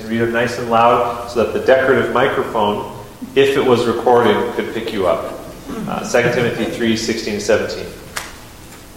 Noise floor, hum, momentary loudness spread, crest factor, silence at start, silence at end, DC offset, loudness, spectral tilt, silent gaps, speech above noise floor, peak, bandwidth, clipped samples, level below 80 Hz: -37 dBFS; none; 15 LU; 16 dB; 0 s; 0 s; under 0.1%; -16 LUFS; -5 dB/octave; none; 21 dB; 0 dBFS; 16.5 kHz; under 0.1%; -44 dBFS